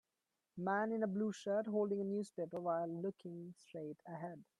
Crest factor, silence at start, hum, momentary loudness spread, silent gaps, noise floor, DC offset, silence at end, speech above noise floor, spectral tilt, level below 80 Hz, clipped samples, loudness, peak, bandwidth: 16 dB; 0.55 s; none; 13 LU; none; -90 dBFS; under 0.1%; 0.15 s; 49 dB; -7 dB/octave; -86 dBFS; under 0.1%; -41 LUFS; -26 dBFS; 11.5 kHz